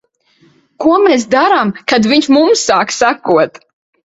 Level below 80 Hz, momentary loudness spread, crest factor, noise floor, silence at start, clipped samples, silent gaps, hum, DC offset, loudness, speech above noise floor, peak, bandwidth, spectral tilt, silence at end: -52 dBFS; 4 LU; 12 dB; -52 dBFS; 0.8 s; under 0.1%; none; none; under 0.1%; -11 LUFS; 41 dB; 0 dBFS; 8 kHz; -3.5 dB/octave; 0.65 s